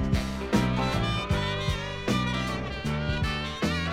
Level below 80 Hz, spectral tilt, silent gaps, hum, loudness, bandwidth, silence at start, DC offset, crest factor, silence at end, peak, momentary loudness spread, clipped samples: -36 dBFS; -5.5 dB/octave; none; none; -28 LUFS; 16 kHz; 0 s; under 0.1%; 16 dB; 0 s; -12 dBFS; 4 LU; under 0.1%